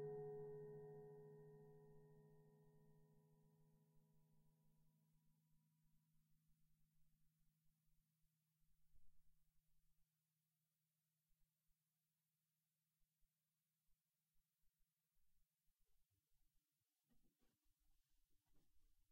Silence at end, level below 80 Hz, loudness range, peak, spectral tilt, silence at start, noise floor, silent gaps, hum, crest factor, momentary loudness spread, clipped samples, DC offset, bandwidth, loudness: 0.1 s; -86 dBFS; 8 LU; -44 dBFS; -8 dB/octave; 0 s; under -90 dBFS; none; none; 22 dB; 13 LU; under 0.1%; under 0.1%; 16 kHz; -59 LUFS